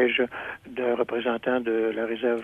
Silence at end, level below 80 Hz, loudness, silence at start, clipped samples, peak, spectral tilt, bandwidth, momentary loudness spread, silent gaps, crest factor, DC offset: 0 s; -64 dBFS; -27 LUFS; 0 s; under 0.1%; -10 dBFS; -6 dB/octave; 4.1 kHz; 5 LU; none; 16 dB; under 0.1%